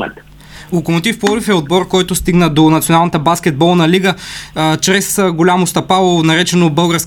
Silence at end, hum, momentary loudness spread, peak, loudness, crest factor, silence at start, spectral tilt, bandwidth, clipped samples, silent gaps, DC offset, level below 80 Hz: 0 s; none; 6 LU; 0 dBFS; -12 LUFS; 12 dB; 0 s; -4.5 dB/octave; 18 kHz; under 0.1%; none; under 0.1%; -38 dBFS